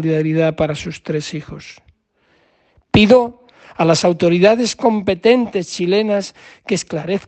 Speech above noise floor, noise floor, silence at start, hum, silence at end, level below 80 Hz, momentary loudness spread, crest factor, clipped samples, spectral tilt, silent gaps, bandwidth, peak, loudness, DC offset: 44 dB; -60 dBFS; 0 s; none; 0.1 s; -48 dBFS; 16 LU; 16 dB; under 0.1%; -5.5 dB/octave; none; 8.8 kHz; 0 dBFS; -16 LUFS; under 0.1%